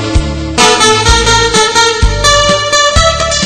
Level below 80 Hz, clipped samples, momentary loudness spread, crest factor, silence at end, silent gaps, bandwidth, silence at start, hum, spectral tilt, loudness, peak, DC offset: -18 dBFS; 2%; 3 LU; 8 dB; 0 s; none; 12 kHz; 0 s; none; -2.5 dB/octave; -7 LUFS; 0 dBFS; under 0.1%